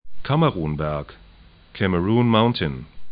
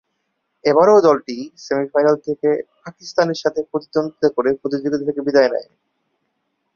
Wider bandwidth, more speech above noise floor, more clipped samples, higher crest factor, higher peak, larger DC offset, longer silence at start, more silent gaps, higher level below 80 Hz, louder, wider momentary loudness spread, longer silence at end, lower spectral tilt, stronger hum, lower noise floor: second, 5 kHz vs 7 kHz; second, 27 dB vs 55 dB; neither; about the same, 18 dB vs 16 dB; about the same, -4 dBFS vs -2 dBFS; neither; second, 0.05 s vs 0.65 s; neither; first, -42 dBFS vs -62 dBFS; second, -21 LUFS vs -18 LUFS; first, 16 LU vs 12 LU; second, 0 s vs 1.15 s; first, -12 dB/octave vs -5.5 dB/octave; neither; second, -47 dBFS vs -72 dBFS